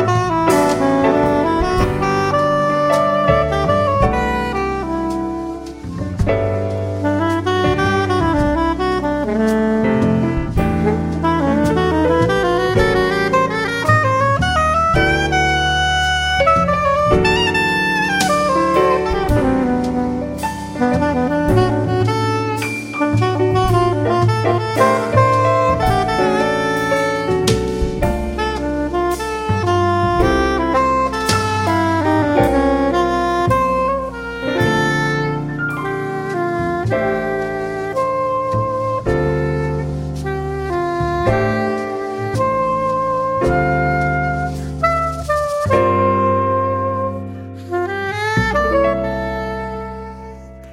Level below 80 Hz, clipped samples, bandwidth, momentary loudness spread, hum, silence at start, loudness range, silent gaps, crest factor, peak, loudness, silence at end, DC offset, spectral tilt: -30 dBFS; under 0.1%; 16.5 kHz; 8 LU; none; 0 s; 5 LU; none; 16 dB; -2 dBFS; -17 LUFS; 0 s; under 0.1%; -6 dB/octave